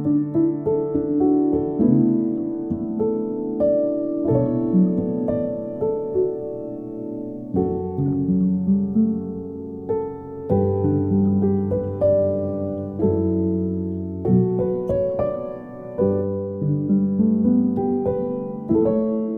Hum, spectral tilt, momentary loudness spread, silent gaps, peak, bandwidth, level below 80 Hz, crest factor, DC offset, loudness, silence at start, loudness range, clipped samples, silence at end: none; -13.5 dB/octave; 10 LU; none; -6 dBFS; 2.5 kHz; -48 dBFS; 14 dB; under 0.1%; -22 LUFS; 0 s; 2 LU; under 0.1%; 0 s